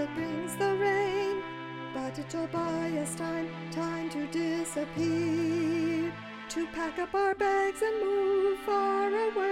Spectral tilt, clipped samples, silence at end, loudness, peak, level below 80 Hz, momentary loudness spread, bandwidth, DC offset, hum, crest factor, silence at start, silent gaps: -5 dB/octave; under 0.1%; 0 s; -31 LUFS; -18 dBFS; -62 dBFS; 9 LU; 15.5 kHz; under 0.1%; none; 12 dB; 0 s; none